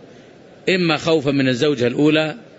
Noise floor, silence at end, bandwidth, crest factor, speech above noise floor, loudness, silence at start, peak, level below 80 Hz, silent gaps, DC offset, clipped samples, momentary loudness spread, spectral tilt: -44 dBFS; 0.15 s; 8 kHz; 14 dB; 26 dB; -18 LUFS; 0.65 s; -4 dBFS; -56 dBFS; none; under 0.1%; under 0.1%; 3 LU; -6 dB/octave